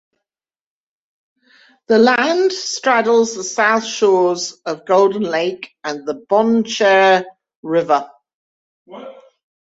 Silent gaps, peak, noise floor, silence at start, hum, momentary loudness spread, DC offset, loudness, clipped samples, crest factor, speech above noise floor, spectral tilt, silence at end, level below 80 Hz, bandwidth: 7.55-7.63 s, 8.34-8.86 s; -2 dBFS; under -90 dBFS; 1.9 s; none; 14 LU; under 0.1%; -16 LUFS; under 0.1%; 16 dB; over 74 dB; -3.5 dB/octave; 0.6 s; -66 dBFS; 8 kHz